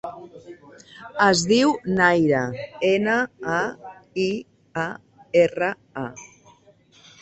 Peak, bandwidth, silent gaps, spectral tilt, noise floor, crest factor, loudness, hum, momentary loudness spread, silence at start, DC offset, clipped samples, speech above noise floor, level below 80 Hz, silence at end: -4 dBFS; 8.4 kHz; none; -4.5 dB/octave; -55 dBFS; 20 dB; -22 LUFS; none; 20 LU; 0.05 s; under 0.1%; under 0.1%; 34 dB; -60 dBFS; 0.95 s